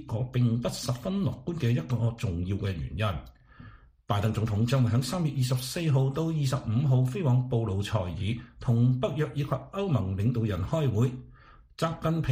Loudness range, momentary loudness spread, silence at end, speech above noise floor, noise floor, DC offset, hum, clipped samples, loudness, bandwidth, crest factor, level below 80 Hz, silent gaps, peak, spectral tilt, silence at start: 4 LU; 7 LU; 0 s; 26 dB; -53 dBFS; under 0.1%; none; under 0.1%; -28 LUFS; 15.5 kHz; 16 dB; -50 dBFS; none; -12 dBFS; -7 dB/octave; 0 s